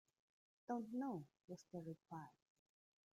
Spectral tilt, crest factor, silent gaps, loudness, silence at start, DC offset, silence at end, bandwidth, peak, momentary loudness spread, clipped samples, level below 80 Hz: -7.5 dB/octave; 20 dB; 1.44-1.48 s; -51 LUFS; 0.7 s; under 0.1%; 0.85 s; 14.5 kHz; -32 dBFS; 13 LU; under 0.1%; under -90 dBFS